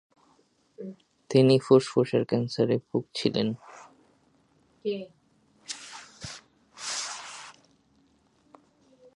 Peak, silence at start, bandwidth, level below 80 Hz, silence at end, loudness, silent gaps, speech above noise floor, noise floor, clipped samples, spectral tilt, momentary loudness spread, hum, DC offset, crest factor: -6 dBFS; 0.8 s; 11.5 kHz; -70 dBFS; 1.65 s; -26 LUFS; none; 41 dB; -66 dBFS; under 0.1%; -5.5 dB/octave; 23 LU; none; under 0.1%; 22 dB